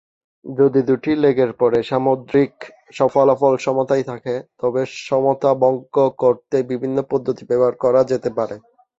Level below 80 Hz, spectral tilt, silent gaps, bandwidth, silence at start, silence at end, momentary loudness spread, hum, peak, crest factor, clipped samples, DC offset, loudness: -58 dBFS; -7 dB/octave; none; 7.8 kHz; 0.45 s; 0.4 s; 8 LU; none; -2 dBFS; 16 dB; under 0.1%; under 0.1%; -18 LUFS